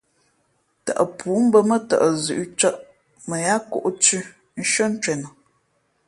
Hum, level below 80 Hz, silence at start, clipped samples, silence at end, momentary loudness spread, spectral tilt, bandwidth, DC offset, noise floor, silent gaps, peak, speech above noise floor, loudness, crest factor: none; -66 dBFS; 0.85 s; under 0.1%; 0.8 s; 14 LU; -3.5 dB/octave; 11.5 kHz; under 0.1%; -67 dBFS; none; -2 dBFS; 47 dB; -20 LUFS; 20 dB